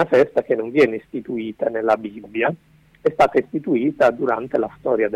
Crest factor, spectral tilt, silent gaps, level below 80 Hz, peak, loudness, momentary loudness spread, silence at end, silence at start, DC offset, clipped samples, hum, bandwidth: 16 dB; -7 dB/octave; none; -56 dBFS; -4 dBFS; -20 LUFS; 10 LU; 0 s; 0 s; under 0.1%; under 0.1%; none; 11 kHz